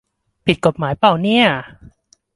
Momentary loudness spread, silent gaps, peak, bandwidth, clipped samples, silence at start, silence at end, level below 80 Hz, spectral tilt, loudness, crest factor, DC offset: 8 LU; none; 0 dBFS; 11.5 kHz; under 0.1%; 0.45 s; 0.7 s; -48 dBFS; -6 dB/octave; -16 LUFS; 18 dB; under 0.1%